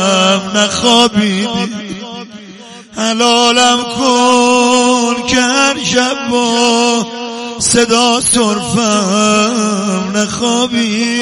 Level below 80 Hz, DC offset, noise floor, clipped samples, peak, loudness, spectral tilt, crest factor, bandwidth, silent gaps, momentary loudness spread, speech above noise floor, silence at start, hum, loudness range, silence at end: -46 dBFS; under 0.1%; -33 dBFS; 0.1%; 0 dBFS; -11 LUFS; -3 dB/octave; 12 dB; 12 kHz; none; 10 LU; 22 dB; 0 s; none; 3 LU; 0 s